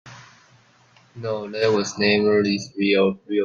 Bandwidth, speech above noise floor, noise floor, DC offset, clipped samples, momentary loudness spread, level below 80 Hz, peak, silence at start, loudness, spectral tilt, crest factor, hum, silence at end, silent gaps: 7.4 kHz; 35 dB; -55 dBFS; under 0.1%; under 0.1%; 11 LU; -64 dBFS; -4 dBFS; 0.05 s; -21 LUFS; -5 dB/octave; 18 dB; none; 0 s; none